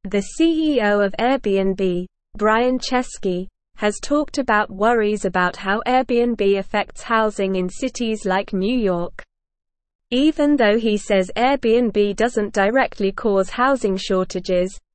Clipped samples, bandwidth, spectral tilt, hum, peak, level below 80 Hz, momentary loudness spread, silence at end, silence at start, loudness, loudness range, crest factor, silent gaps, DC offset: under 0.1%; 8.8 kHz; -5 dB/octave; none; -4 dBFS; -42 dBFS; 7 LU; 0.15 s; 0.05 s; -19 LUFS; 3 LU; 14 dB; 9.95-9.99 s; 0.4%